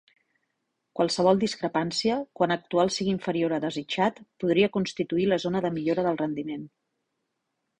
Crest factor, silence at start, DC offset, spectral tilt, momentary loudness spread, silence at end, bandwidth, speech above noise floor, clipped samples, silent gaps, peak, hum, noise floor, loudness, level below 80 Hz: 20 dB; 0.95 s; under 0.1%; -5.5 dB/octave; 7 LU; 1.1 s; 10 kHz; 54 dB; under 0.1%; none; -8 dBFS; none; -80 dBFS; -26 LUFS; -64 dBFS